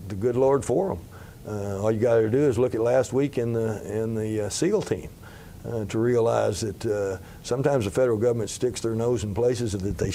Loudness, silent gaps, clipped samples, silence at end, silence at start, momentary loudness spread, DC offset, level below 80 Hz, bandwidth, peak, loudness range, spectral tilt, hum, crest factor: -25 LUFS; none; under 0.1%; 0 s; 0 s; 12 LU; under 0.1%; -48 dBFS; 16 kHz; -8 dBFS; 3 LU; -6 dB/octave; none; 16 dB